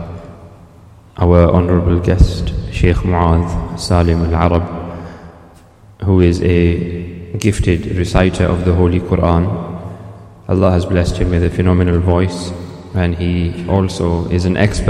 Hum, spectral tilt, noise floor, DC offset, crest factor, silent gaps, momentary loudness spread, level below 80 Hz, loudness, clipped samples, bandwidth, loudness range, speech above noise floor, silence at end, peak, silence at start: none; -7.5 dB/octave; -42 dBFS; under 0.1%; 14 dB; none; 14 LU; -26 dBFS; -15 LUFS; under 0.1%; 11 kHz; 2 LU; 29 dB; 0 s; 0 dBFS; 0 s